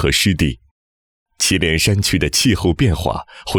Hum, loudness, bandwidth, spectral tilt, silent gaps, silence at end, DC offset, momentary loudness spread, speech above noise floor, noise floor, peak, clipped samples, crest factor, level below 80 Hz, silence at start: none; -16 LUFS; 19.5 kHz; -4 dB/octave; 0.71-1.26 s; 0 s; under 0.1%; 7 LU; over 74 dB; under -90 dBFS; -4 dBFS; under 0.1%; 12 dB; -30 dBFS; 0 s